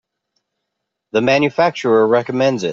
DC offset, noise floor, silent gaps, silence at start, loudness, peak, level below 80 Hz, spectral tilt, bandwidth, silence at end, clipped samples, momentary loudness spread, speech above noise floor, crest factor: under 0.1%; -77 dBFS; none; 1.15 s; -15 LUFS; -2 dBFS; -62 dBFS; -5.5 dB/octave; 7.6 kHz; 0 s; under 0.1%; 4 LU; 62 dB; 14 dB